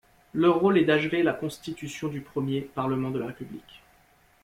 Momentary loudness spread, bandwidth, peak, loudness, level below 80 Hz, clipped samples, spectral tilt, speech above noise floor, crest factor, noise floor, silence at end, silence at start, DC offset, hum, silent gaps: 15 LU; 15.5 kHz; -10 dBFS; -26 LUFS; -62 dBFS; under 0.1%; -6.5 dB/octave; 35 dB; 16 dB; -61 dBFS; 0.65 s; 0.35 s; under 0.1%; none; none